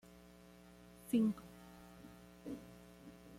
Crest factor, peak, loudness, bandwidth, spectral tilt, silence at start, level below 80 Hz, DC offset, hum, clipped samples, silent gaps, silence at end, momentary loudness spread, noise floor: 20 dB; -24 dBFS; -40 LUFS; 16 kHz; -6.5 dB/octave; 1.05 s; -70 dBFS; under 0.1%; none; under 0.1%; none; 0 s; 25 LU; -61 dBFS